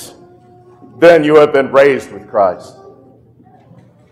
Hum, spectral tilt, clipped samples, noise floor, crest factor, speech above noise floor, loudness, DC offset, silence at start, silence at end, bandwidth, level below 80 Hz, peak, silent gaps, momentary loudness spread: none; -6 dB/octave; under 0.1%; -45 dBFS; 14 dB; 35 dB; -10 LUFS; under 0.1%; 0 s; 1.5 s; 13 kHz; -56 dBFS; 0 dBFS; none; 12 LU